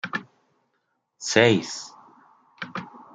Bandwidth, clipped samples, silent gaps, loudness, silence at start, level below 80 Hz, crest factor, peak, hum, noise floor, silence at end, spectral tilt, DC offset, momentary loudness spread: 9.4 kHz; under 0.1%; none; -23 LUFS; 0.05 s; -70 dBFS; 26 dB; -2 dBFS; none; -74 dBFS; 0.15 s; -4 dB/octave; under 0.1%; 20 LU